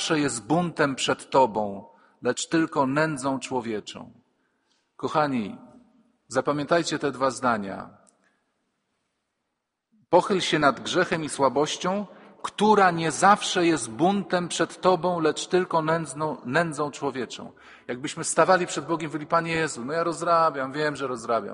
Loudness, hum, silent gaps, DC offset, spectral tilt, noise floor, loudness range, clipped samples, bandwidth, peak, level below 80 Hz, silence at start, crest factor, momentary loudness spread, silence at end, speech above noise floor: -24 LUFS; none; none; under 0.1%; -4 dB/octave; -81 dBFS; 6 LU; under 0.1%; 10.5 kHz; -4 dBFS; -64 dBFS; 0 s; 22 dB; 13 LU; 0 s; 57 dB